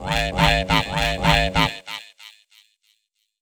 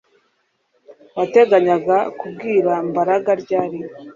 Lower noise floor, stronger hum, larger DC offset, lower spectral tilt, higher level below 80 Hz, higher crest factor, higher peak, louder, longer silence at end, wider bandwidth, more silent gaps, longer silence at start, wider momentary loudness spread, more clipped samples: first, -71 dBFS vs -66 dBFS; neither; neither; second, -4.5 dB/octave vs -7 dB/octave; first, -32 dBFS vs -66 dBFS; first, 22 dB vs 16 dB; about the same, -2 dBFS vs -2 dBFS; about the same, -19 LUFS vs -17 LUFS; first, 1.1 s vs 0.05 s; first, over 20 kHz vs 7.4 kHz; neither; second, 0 s vs 0.9 s; about the same, 15 LU vs 14 LU; neither